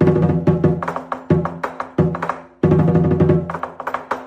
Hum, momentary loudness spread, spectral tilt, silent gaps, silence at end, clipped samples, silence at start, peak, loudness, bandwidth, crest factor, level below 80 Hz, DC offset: none; 12 LU; -10 dB/octave; none; 0 s; under 0.1%; 0 s; -4 dBFS; -18 LUFS; 7 kHz; 14 dB; -40 dBFS; under 0.1%